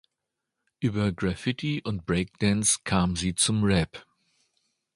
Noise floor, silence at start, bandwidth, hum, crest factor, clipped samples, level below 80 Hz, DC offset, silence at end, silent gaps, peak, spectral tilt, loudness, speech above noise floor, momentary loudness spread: -84 dBFS; 0.8 s; 11.5 kHz; none; 18 dB; under 0.1%; -46 dBFS; under 0.1%; 0.95 s; none; -8 dBFS; -4 dB/octave; -26 LUFS; 59 dB; 8 LU